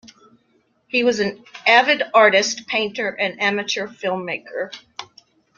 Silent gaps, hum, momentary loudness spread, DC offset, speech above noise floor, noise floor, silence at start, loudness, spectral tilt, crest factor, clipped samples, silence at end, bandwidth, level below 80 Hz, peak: none; none; 15 LU; under 0.1%; 44 dB; -63 dBFS; 0.95 s; -19 LUFS; -2.5 dB/octave; 20 dB; under 0.1%; 0.55 s; 7.4 kHz; -68 dBFS; -2 dBFS